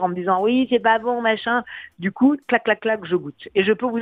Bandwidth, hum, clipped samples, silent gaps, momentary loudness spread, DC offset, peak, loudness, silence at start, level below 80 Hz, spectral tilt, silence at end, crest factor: 4.7 kHz; none; under 0.1%; none; 7 LU; under 0.1%; -2 dBFS; -20 LUFS; 0 s; -62 dBFS; -8 dB/octave; 0 s; 18 dB